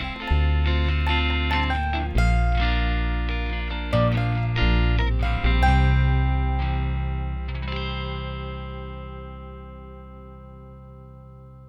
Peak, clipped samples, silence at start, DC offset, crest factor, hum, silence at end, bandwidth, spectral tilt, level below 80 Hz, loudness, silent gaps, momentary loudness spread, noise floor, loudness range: -8 dBFS; under 0.1%; 0 s; under 0.1%; 16 dB; 60 Hz at -45 dBFS; 0 s; 7.4 kHz; -7 dB/octave; -26 dBFS; -24 LUFS; none; 21 LU; -44 dBFS; 12 LU